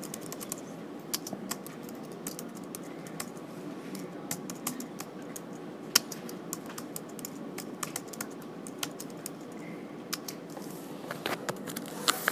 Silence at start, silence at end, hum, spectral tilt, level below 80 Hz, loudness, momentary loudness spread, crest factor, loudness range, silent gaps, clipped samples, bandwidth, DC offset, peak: 0 s; 0 s; none; -2.5 dB/octave; -78 dBFS; -37 LUFS; 12 LU; 36 dB; 5 LU; none; under 0.1%; 20 kHz; under 0.1%; -2 dBFS